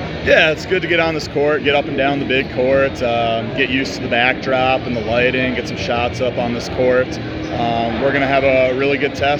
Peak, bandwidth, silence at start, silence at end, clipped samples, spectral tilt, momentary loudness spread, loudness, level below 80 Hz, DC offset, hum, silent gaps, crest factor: 0 dBFS; 9.8 kHz; 0 s; 0 s; under 0.1%; -5.5 dB/octave; 6 LU; -16 LUFS; -38 dBFS; under 0.1%; none; none; 16 dB